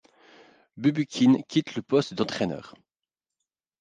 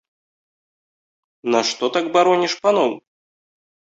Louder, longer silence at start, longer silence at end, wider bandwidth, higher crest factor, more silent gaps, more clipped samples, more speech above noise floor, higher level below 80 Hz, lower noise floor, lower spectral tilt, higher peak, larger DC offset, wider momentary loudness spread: second, -25 LUFS vs -18 LUFS; second, 0.75 s vs 1.45 s; about the same, 1.1 s vs 1 s; first, 9.2 kHz vs 8 kHz; about the same, 18 dB vs 18 dB; neither; neither; second, 65 dB vs over 72 dB; about the same, -66 dBFS vs -70 dBFS; about the same, -90 dBFS vs under -90 dBFS; first, -6 dB/octave vs -3.5 dB/octave; second, -10 dBFS vs -2 dBFS; neither; about the same, 9 LU vs 8 LU